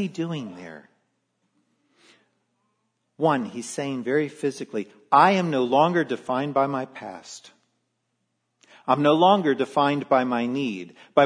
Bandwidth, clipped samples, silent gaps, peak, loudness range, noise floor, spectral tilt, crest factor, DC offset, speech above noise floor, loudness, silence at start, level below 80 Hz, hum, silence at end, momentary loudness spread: 10.5 kHz; under 0.1%; none; -2 dBFS; 9 LU; -76 dBFS; -5.5 dB/octave; 22 dB; under 0.1%; 53 dB; -23 LUFS; 0 s; -76 dBFS; none; 0 s; 19 LU